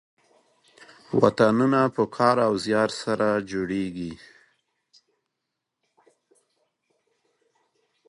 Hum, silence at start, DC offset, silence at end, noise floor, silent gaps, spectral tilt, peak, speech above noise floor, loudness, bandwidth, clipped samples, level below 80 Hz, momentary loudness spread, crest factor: none; 1.1 s; under 0.1%; 3.9 s; -82 dBFS; none; -6 dB/octave; -2 dBFS; 60 dB; -23 LUFS; 11 kHz; under 0.1%; -62 dBFS; 12 LU; 24 dB